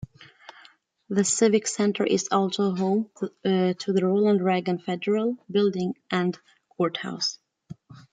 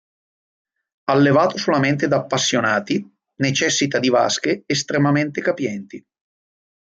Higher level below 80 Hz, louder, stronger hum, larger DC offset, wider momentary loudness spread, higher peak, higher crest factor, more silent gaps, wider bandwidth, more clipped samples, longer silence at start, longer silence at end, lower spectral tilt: second, -68 dBFS vs -62 dBFS; second, -25 LUFS vs -19 LUFS; neither; neither; about the same, 9 LU vs 9 LU; second, -8 dBFS vs -4 dBFS; about the same, 18 dB vs 16 dB; neither; about the same, 9.6 kHz vs 9.2 kHz; neither; second, 0 s vs 1.1 s; second, 0.15 s vs 1 s; about the same, -5 dB/octave vs -4.5 dB/octave